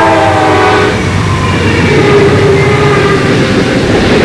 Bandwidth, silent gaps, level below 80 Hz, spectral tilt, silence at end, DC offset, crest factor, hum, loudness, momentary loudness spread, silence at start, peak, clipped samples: 11 kHz; none; -26 dBFS; -6 dB/octave; 0 s; under 0.1%; 6 dB; none; -7 LUFS; 4 LU; 0 s; -2 dBFS; under 0.1%